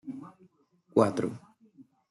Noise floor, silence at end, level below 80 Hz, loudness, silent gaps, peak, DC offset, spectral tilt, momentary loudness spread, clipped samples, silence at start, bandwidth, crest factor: -64 dBFS; 0.3 s; -74 dBFS; -28 LUFS; none; -10 dBFS; under 0.1%; -7.5 dB/octave; 23 LU; under 0.1%; 0.05 s; 12 kHz; 24 dB